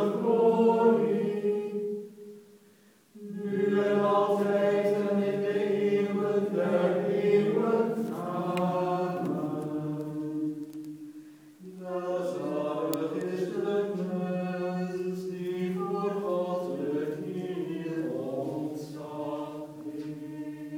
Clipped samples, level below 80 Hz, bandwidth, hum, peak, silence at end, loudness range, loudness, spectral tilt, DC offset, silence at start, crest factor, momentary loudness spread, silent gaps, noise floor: under 0.1%; -80 dBFS; 19 kHz; none; -10 dBFS; 0 s; 8 LU; -29 LUFS; -7.5 dB/octave; under 0.1%; 0 s; 18 dB; 14 LU; none; -60 dBFS